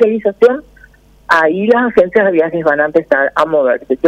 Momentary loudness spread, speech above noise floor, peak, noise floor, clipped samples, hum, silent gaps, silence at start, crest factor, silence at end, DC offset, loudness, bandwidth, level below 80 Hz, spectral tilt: 3 LU; 32 dB; 0 dBFS; -44 dBFS; under 0.1%; none; none; 0 s; 12 dB; 0 s; under 0.1%; -12 LUFS; 9.2 kHz; -50 dBFS; -6.5 dB/octave